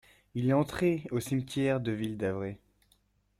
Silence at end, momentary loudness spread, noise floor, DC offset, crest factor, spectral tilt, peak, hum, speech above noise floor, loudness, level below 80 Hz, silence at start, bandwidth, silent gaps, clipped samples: 0.85 s; 11 LU; -70 dBFS; under 0.1%; 18 dB; -7 dB/octave; -14 dBFS; 50 Hz at -60 dBFS; 40 dB; -31 LUFS; -60 dBFS; 0.35 s; 16 kHz; none; under 0.1%